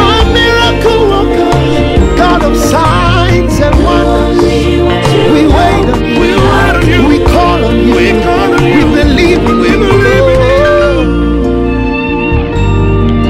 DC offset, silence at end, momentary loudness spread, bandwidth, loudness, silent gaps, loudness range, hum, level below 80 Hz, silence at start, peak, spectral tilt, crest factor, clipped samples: under 0.1%; 0 s; 4 LU; 15.5 kHz; -8 LUFS; none; 1 LU; none; -14 dBFS; 0 s; 0 dBFS; -6 dB/octave; 6 dB; 0.8%